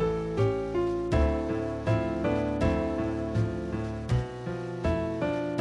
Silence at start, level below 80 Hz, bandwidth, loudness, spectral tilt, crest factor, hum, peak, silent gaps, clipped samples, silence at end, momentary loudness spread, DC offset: 0 s; -38 dBFS; 10.5 kHz; -29 LUFS; -8 dB/octave; 14 dB; none; -14 dBFS; none; under 0.1%; 0 s; 6 LU; under 0.1%